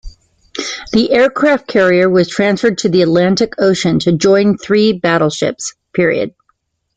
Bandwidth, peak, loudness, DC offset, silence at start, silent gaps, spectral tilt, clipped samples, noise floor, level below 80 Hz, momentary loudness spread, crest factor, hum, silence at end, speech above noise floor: 9.4 kHz; 0 dBFS; -13 LUFS; under 0.1%; 0.05 s; none; -5 dB/octave; under 0.1%; -62 dBFS; -44 dBFS; 10 LU; 12 dB; none; 0.7 s; 50 dB